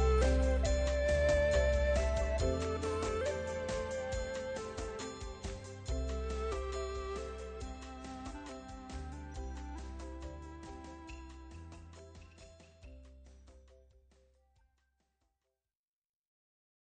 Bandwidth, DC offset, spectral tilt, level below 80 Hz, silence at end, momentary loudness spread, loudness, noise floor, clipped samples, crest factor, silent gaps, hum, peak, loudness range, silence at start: 9.4 kHz; under 0.1%; -5.5 dB/octave; -40 dBFS; 3.25 s; 22 LU; -37 LUFS; under -90 dBFS; under 0.1%; 18 dB; none; none; -18 dBFS; 21 LU; 0 s